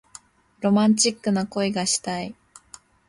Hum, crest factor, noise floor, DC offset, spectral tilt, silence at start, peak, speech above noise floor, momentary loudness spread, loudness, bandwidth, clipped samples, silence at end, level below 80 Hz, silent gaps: none; 18 dB; -50 dBFS; under 0.1%; -4 dB/octave; 0.6 s; -6 dBFS; 28 dB; 12 LU; -22 LUFS; 11.5 kHz; under 0.1%; 0.75 s; -62 dBFS; none